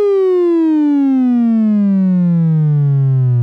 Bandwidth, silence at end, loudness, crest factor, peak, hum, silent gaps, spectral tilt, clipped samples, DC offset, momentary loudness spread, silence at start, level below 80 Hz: 4.8 kHz; 0 s; -13 LUFS; 4 dB; -8 dBFS; none; none; -12 dB/octave; under 0.1%; under 0.1%; 1 LU; 0 s; -70 dBFS